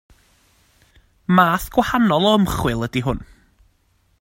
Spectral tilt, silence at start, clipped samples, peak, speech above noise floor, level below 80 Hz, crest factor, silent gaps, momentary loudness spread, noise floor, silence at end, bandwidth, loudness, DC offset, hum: -6 dB/octave; 1.3 s; under 0.1%; 0 dBFS; 44 dB; -40 dBFS; 20 dB; none; 10 LU; -62 dBFS; 0.95 s; 16.5 kHz; -18 LUFS; under 0.1%; none